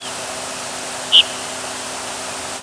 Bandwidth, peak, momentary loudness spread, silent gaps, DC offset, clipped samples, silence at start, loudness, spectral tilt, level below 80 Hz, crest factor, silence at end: 11 kHz; 0 dBFS; 14 LU; none; under 0.1%; under 0.1%; 0 s; -18 LUFS; 0 dB/octave; -58 dBFS; 22 dB; 0 s